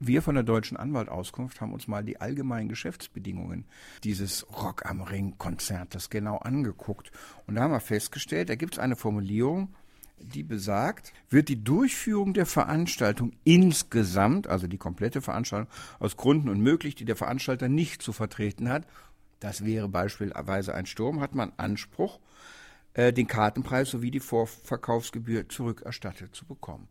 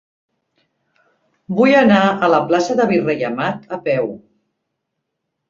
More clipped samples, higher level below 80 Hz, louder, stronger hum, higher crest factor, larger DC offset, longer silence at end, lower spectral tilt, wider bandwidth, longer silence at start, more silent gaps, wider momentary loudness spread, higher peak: neither; first, -54 dBFS vs -60 dBFS; second, -29 LUFS vs -16 LUFS; neither; first, 22 dB vs 16 dB; neither; second, 0.05 s vs 1.3 s; about the same, -5.5 dB/octave vs -6 dB/octave; first, 16.5 kHz vs 7.6 kHz; second, 0 s vs 1.5 s; neither; first, 14 LU vs 11 LU; second, -8 dBFS vs -2 dBFS